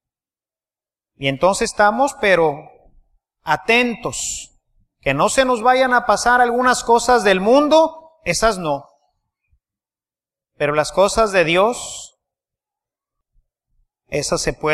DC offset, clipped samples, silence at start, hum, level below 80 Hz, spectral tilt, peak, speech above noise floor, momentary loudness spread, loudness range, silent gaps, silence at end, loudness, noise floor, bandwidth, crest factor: under 0.1%; under 0.1%; 1.2 s; none; -44 dBFS; -3.5 dB/octave; -2 dBFS; over 74 dB; 11 LU; 6 LU; none; 0 s; -17 LUFS; under -90 dBFS; 14.5 kHz; 18 dB